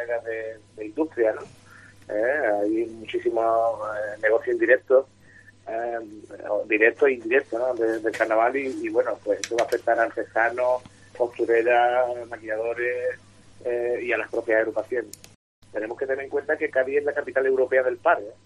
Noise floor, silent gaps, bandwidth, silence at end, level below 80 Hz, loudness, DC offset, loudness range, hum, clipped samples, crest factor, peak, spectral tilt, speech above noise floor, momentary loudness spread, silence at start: -51 dBFS; 15.35-15.62 s; 13 kHz; 0.1 s; -66 dBFS; -24 LUFS; under 0.1%; 4 LU; none; under 0.1%; 20 dB; -4 dBFS; -4.5 dB/octave; 28 dB; 13 LU; 0 s